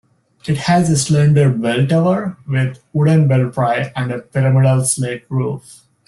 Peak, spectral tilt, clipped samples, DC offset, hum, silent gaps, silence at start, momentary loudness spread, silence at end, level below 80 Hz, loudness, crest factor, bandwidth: -2 dBFS; -6 dB/octave; under 0.1%; under 0.1%; none; none; 0.45 s; 9 LU; 0.35 s; -50 dBFS; -16 LUFS; 14 dB; 12.5 kHz